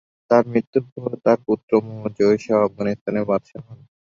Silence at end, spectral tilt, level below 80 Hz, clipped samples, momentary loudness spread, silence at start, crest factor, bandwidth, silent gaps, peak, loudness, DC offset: 0.4 s; -8 dB/octave; -60 dBFS; under 0.1%; 10 LU; 0.3 s; 18 dB; 7.4 kHz; 0.67-0.73 s, 0.92-0.96 s, 1.63-1.68 s, 3.01-3.06 s; -2 dBFS; -21 LUFS; under 0.1%